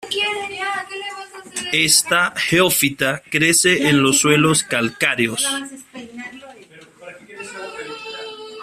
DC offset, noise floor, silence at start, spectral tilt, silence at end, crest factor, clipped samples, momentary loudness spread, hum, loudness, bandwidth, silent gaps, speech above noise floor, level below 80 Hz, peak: under 0.1%; -45 dBFS; 0 s; -2.5 dB/octave; 0 s; 20 dB; under 0.1%; 20 LU; none; -16 LUFS; 16 kHz; none; 28 dB; -56 dBFS; 0 dBFS